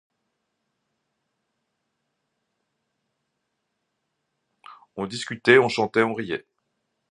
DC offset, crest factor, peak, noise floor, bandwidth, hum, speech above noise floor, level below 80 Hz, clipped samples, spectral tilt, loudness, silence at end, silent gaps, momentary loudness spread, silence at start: under 0.1%; 28 dB; -2 dBFS; -78 dBFS; 10.5 kHz; none; 56 dB; -70 dBFS; under 0.1%; -5 dB/octave; -22 LUFS; 0.7 s; none; 16 LU; 4.7 s